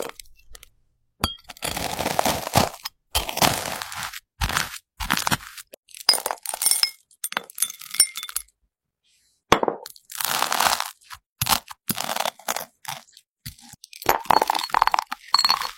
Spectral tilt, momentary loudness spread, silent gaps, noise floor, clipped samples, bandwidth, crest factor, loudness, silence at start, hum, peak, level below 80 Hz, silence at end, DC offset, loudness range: -1.5 dB/octave; 16 LU; 5.77-5.83 s, 11.26-11.36 s, 13.28-13.36 s; -75 dBFS; under 0.1%; 16.5 kHz; 26 dB; -23 LUFS; 0 s; none; 0 dBFS; -46 dBFS; 0.05 s; under 0.1%; 3 LU